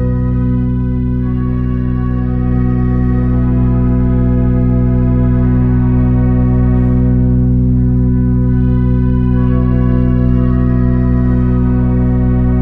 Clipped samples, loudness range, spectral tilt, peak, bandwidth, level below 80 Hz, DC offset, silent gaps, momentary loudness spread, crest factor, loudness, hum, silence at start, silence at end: under 0.1%; 2 LU; -12.5 dB/octave; 0 dBFS; 3.1 kHz; -16 dBFS; under 0.1%; none; 4 LU; 10 dB; -13 LUFS; none; 0 s; 0 s